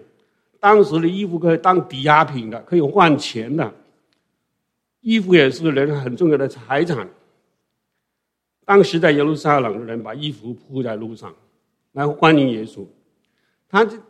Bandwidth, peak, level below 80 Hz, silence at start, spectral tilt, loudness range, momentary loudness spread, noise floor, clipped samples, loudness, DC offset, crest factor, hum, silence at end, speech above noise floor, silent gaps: 10 kHz; 0 dBFS; -64 dBFS; 0.65 s; -6.5 dB/octave; 5 LU; 15 LU; -78 dBFS; under 0.1%; -17 LUFS; under 0.1%; 18 dB; none; 0.1 s; 61 dB; none